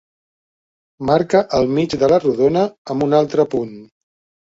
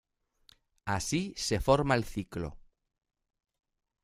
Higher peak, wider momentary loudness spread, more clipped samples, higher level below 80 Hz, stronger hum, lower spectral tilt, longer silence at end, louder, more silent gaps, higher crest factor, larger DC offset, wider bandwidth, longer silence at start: first, -2 dBFS vs -10 dBFS; second, 7 LU vs 14 LU; neither; about the same, -50 dBFS vs -50 dBFS; neither; first, -7 dB/octave vs -5 dB/octave; second, 0.55 s vs 1.45 s; first, -17 LUFS vs -31 LUFS; first, 2.78-2.85 s vs none; second, 16 dB vs 24 dB; neither; second, 7.8 kHz vs 15.5 kHz; first, 1 s vs 0.85 s